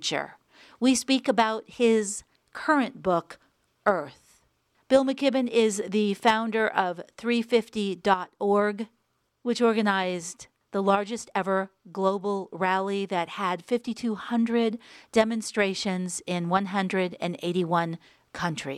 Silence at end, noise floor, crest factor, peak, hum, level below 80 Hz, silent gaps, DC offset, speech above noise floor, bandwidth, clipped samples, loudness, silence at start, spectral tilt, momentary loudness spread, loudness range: 0 s; -69 dBFS; 20 dB; -6 dBFS; none; -66 dBFS; none; under 0.1%; 43 dB; 14 kHz; under 0.1%; -26 LUFS; 0 s; -4.5 dB/octave; 10 LU; 3 LU